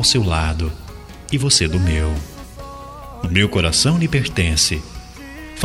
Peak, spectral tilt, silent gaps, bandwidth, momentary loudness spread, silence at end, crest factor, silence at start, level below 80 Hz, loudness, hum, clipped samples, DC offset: -2 dBFS; -3.5 dB/octave; none; 15.5 kHz; 21 LU; 0 s; 18 dB; 0 s; -30 dBFS; -17 LUFS; none; under 0.1%; under 0.1%